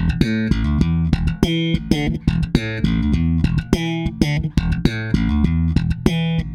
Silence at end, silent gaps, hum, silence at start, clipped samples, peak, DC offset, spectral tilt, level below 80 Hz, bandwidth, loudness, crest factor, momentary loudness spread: 0 s; none; none; 0 s; under 0.1%; 0 dBFS; under 0.1%; -7 dB/octave; -26 dBFS; 12.5 kHz; -19 LUFS; 18 dB; 2 LU